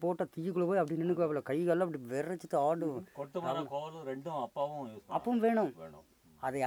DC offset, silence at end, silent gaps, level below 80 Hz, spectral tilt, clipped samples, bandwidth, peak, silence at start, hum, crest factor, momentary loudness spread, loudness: under 0.1%; 0 s; none; -76 dBFS; -7.5 dB/octave; under 0.1%; over 20 kHz; -18 dBFS; 0 s; none; 16 dB; 11 LU; -35 LUFS